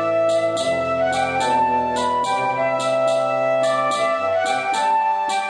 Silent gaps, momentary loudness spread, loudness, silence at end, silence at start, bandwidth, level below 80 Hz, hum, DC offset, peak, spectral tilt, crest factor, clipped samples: none; 2 LU; -19 LUFS; 0 s; 0 s; 10 kHz; -58 dBFS; none; under 0.1%; -8 dBFS; -3.5 dB/octave; 12 dB; under 0.1%